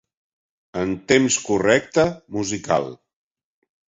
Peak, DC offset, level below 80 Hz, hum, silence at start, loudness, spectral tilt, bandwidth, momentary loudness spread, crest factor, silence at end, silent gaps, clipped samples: -2 dBFS; under 0.1%; -52 dBFS; none; 0.75 s; -20 LUFS; -4 dB/octave; 8.2 kHz; 10 LU; 20 dB; 0.95 s; none; under 0.1%